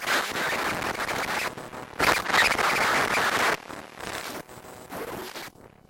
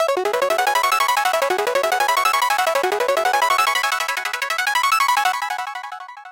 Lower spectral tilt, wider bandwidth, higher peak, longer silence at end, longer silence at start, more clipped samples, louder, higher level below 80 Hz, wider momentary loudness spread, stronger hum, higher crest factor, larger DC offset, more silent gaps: first, -2 dB/octave vs 0.5 dB/octave; about the same, 17 kHz vs 17 kHz; about the same, -8 dBFS vs -6 dBFS; first, 0.2 s vs 0 s; about the same, 0 s vs 0 s; neither; second, -25 LUFS vs -18 LUFS; first, -54 dBFS vs -64 dBFS; first, 19 LU vs 7 LU; neither; about the same, 18 dB vs 14 dB; neither; neither